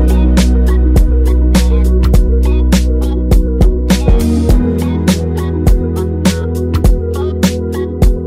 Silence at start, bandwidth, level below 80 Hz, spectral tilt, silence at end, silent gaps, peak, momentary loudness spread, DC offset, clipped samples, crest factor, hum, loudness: 0 s; 15.5 kHz; -12 dBFS; -6.5 dB/octave; 0 s; none; 0 dBFS; 4 LU; under 0.1%; under 0.1%; 10 dB; none; -12 LUFS